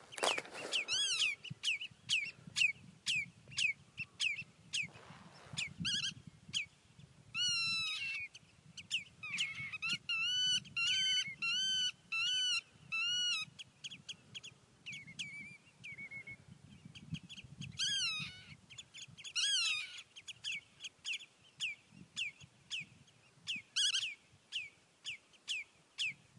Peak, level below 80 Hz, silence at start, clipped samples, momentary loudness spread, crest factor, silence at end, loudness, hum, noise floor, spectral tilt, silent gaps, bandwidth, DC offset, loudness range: -16 dBFS; -78 dBFS; 0 s; under 0.1%; 18 LU; 24 dB; 0.25 s; -37 LUFS; none; -65 dBFS; 0 dB/octave; none; 11.5 kHz; under 0.1%; 10 LU